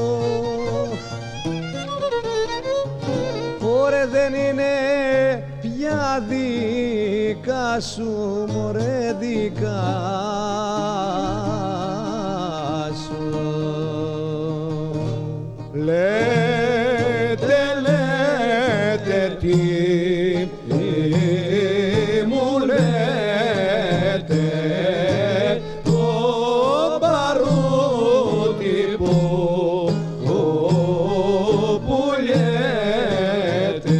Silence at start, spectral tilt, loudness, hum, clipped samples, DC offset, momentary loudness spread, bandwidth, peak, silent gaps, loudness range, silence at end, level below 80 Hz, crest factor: 0 s; -6.5 dB/octave; -20 LUFS; none; under 0.1%; under 0.1%; 7 LU; 10.5 kHz; -6 dBFS; none; 6 LU; 0 s; -44 dBFS; 14 dB